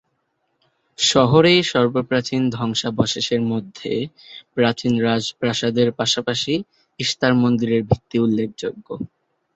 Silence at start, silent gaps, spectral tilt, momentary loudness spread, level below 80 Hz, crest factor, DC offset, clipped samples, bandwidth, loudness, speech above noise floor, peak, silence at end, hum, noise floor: 1 s; none; -5 dB/octave; 15 LU; -50 dBFS; 18 dB; under 0.1%; under 0.1%; 8.2 kHz; -19 LUFS; 51 dB; -2 dBFS; 0.5 s; none; -71 dBFS